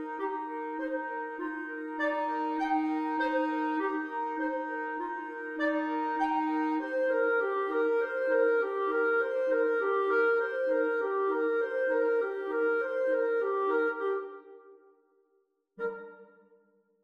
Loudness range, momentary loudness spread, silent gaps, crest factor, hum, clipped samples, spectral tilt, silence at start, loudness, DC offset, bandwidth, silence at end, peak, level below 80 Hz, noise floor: 5 LU; 9 LU; none; 14 dB; none; under 0.1%; -5 dB/octave; 0 s; -30 LUFS; under 0.1%; 6.6 kHz; 0.8 s; -16 dBFS; -76 dBFS; -74 dBFS